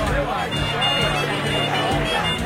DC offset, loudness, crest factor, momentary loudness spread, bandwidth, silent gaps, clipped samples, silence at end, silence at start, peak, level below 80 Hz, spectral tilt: under 0.1%; -20 LUFS; 14 dB; 4 LU; 16 kHz; none; under 0.1%; 0 s; 0 s; -8 dBFS; -34 dBFS; -4.5 dB/octave